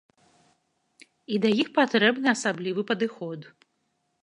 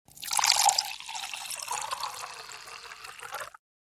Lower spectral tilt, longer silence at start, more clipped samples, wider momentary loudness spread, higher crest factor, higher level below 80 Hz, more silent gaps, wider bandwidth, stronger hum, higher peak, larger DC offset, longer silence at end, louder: first, -4.5 dB/octave vs 3 dB/octave; first, 1.3 s vs 0.15 s; neither; second, 14 LU vs 20 LU; second, 22 dB vs 28 dB; second, -78 dBFS vs -72 dBFS; neither; second, 11 kHz vs 17.5 kHz; neither; about the same, -6 dBFS vs -4 dBFS; neither; first, 0.75 s vs 0.5 s; first, -24 LUFS vs -28 LUFS